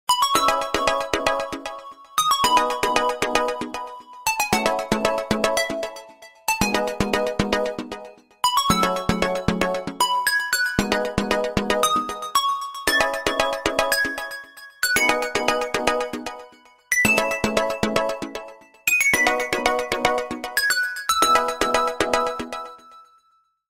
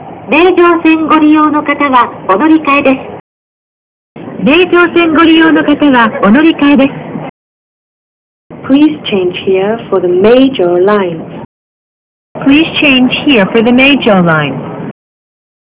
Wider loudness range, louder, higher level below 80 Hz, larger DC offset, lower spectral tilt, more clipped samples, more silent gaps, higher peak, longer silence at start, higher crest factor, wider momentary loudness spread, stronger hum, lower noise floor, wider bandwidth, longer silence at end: about the same, 3 LU vs 4 LU; second, -21 LUFS vs -7 LUFS; about the same, -44 dBFS vs -44 dBFS; neither; second, -2.5 dB/octave vs -10 dB/octave; second, under 0.1% vs 2%; second, none vs 3.20-4.15 s, 7.29-8.50 s, 11.45-12.35 s; about the same, -2 dBFS vs 0 dBFS; about the same, 0.1 s vs 0 s; first, 22 dB vs 8 dB; about the same, 13 LU vs 14 LU; neither; second, -64 dBFS vs under -90 dBFS; first, 16.5 kHz vs 4 kHz; about the same, 0.65 s vs 0.75 s